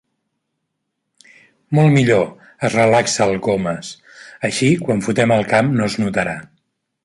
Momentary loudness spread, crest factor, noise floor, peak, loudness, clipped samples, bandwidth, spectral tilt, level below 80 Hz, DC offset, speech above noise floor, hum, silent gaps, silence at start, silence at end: 11 LU; 16 dB; -75 dBFS; -2 dBFS; -17 LUFS; under 0.1%; 11.5 kHz; -5.5 dB/octave; -52 dBFS; under 0.1%; 59 dB; none; none; 1.7 s; 0.6 s